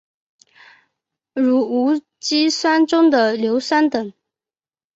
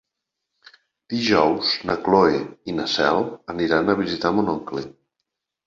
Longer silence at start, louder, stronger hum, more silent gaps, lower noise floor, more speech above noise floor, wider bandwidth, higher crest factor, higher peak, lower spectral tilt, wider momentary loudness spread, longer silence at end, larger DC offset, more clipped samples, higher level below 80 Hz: first, 1.35 s vs 1.1 s; first, -17 LUFS vs -21 LUFS; neither; neither; first, under -90 dBFS vs -82 dBFS; first, over 74 dB vs 61 dB; about the same, 8 kHz vs 7.6 kHz; about the same, 16 dB vs 20 dB; about the same, -4 dBFS vs -2 dBFS; second, -3.5 dB/octave vs -5.5 dB/octave; second, 8 LU vs 12 LU; about the same, 0.85 s vs 0.75 s; neither; neither; second, -66 dBFS vs -54 dBFS